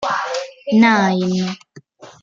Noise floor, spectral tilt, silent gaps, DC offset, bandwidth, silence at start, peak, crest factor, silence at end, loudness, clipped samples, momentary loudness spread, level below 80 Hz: -43 dBFS; -5.5 dB/octave; none; under 0.1%; 7.6 kHz; 0 s; -2 dBFS; 16 dB; 0.15 s; -17 LUFS; under 0.1%; 13 LU; -62 dBFS